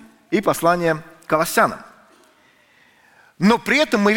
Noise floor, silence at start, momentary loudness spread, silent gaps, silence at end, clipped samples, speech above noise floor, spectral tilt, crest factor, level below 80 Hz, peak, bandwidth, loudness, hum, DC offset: -55 dBFS; 0.3 s; 7 LU; none; 0 s; under 0.1%; 38 dB; -4.5 dB/octave; 18 dB; -52 dBFS; -2 dBFS; 17 kHz; -19 LUFS; none; under 0.1%